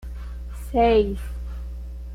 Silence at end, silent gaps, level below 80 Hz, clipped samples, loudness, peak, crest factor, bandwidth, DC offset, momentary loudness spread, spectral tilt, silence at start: 0 s; none; -32 dBFS; under 0.1%; -22 LUFS; -8 dBFS; 16 dB; 15 kHz; under 0.1%; 18 LU; -7 dB/octave; 0 s